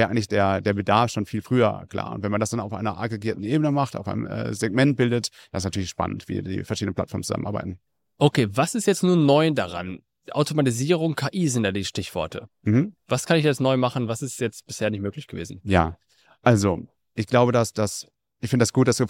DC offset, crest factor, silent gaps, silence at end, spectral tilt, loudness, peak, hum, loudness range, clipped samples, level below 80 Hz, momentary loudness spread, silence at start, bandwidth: under 0.1%; 20 dB; none; 0 s; -5.5 dB/octave; -24 LUFS; -4 dBFS; none; 3 LU; under 0.1%; -52 dBFS; 11 LU; 0 s; 16.5 kHz